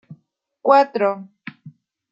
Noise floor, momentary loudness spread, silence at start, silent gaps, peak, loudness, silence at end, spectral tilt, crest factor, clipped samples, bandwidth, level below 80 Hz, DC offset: -62 dBFS; 23 LU; 0.1 s; none; -2 dBFS; -18 LUFS; 0.45 s; -6.5 dB/octave; 20 dB; under 0.1%; 7.6 kHz; -78 dBFS; under 0.1%